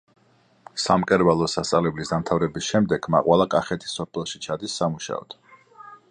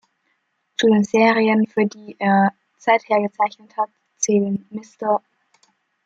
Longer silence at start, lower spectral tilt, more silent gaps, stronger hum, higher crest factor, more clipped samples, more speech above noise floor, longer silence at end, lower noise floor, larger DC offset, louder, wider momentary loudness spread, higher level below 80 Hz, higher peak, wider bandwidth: about the same, 0.75 s vs 0.8 s; about the same, -5 dB/octave vs -5 dB/octave; neither; neither; about the same, 20 dB vs 18 dB; neither; second, 38 dB vs 51 dB; second, 0.15 s vs 0.9 s; second, -60 dBFS vs -69 dBFS; neither; second, -23 LUFS vs -19 LUFS; about the same, 12 LU vs 11 LU; first, -52 dBFS vs -70 dBFS; about the same, -4 dBFS vs -2 dBFS; first, 10.5 kHz vs 8 kHz